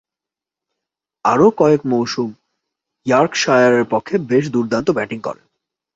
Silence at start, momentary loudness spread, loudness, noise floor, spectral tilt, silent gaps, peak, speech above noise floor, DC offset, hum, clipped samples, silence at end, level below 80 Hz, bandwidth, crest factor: 1.25 s; 12 LU; -16 LUFS; -87 dBFS; -5.5 dB/octave; none; 0 dBFS; 72 dB; under 0.1%; none; under 0.1%; 0.6 s; -56 dBFS; 7.8 kHz; 16 dB